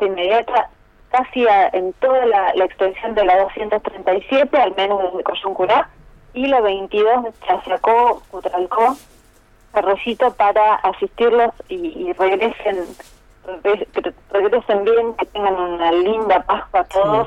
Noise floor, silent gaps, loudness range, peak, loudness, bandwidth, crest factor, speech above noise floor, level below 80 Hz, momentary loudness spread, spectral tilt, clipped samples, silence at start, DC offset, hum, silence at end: -50 dBFS; none; 3 LU; -4 dBFS; -17 LUFS; 11.5 kHz; 14 dB; 34 dB; -48 dBFS; 9 LU; -5.5 dB/octave; under 0.1%; 0 s; under 0.1%; none; 0 s